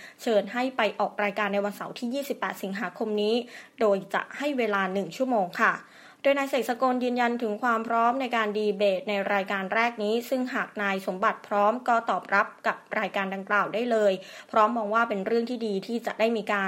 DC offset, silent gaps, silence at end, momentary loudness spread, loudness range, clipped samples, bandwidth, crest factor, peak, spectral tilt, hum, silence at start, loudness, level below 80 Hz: under 0.1%; none; 0 s; 7 LU; 3 LU; under 0.1%; 16 kHz; 20 dB; -8 dBFS; -5 dB/octave; none; 0 s; -27 LUFS; -82 dBFS